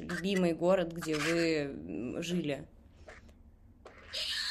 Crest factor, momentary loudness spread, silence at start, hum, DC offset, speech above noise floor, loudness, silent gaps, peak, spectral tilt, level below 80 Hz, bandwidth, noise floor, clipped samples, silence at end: 16 dB; 21 LU; 0 s; none; under 0.1%; 26 dB; -33 LUFS; none; -18 dBFS; -5 dB/octave; -60 dBFS; 14 kHz; -58 dBFS; under 0.1%; 0 s